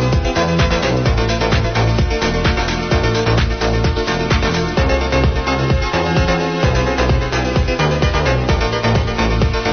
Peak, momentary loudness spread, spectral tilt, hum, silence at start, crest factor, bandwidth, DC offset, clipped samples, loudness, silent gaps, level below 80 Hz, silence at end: -2 dBFS; 2 LU; -6 dB/octave; none; 0 s; 12 dB; 6.6 kHz; 0.4%; under 0.1%; -16 LUFS; none; -20 dBFS; 0 s